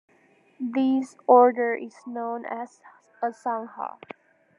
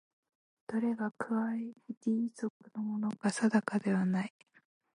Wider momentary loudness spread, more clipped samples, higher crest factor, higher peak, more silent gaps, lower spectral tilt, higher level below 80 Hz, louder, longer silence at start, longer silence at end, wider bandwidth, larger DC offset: first, 19 LU vs 11 LU; neither; about the same, 22 dB vs 20 dB; first, -4 dBFS vs -14 dBFS; second, none vs 1.97-2.01 s, 2.50-2.60 s; about the same, -6 dB/octave vs -6.5 dB/octave; second, under -90 dBFS vs -82 dBFS; first, -24 LUFS vs -34 LUFS; about the same, 0.6 s vs 0.7 s; about the same, 0.7 s vs 0.65 s; about the same, 10 kHz vs 11 kHz; neither